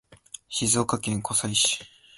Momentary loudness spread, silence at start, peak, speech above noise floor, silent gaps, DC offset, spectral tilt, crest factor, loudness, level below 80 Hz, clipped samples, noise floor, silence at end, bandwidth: 14 LU; 0.1 s; -8 dBFS; 21 dB; none; under 0.1%; -2.5 dB/octave; 20 dB; -24 LUFS; -56 dBFS; under 0.1%; -47 dBFS; 0.3 s; 12 kHz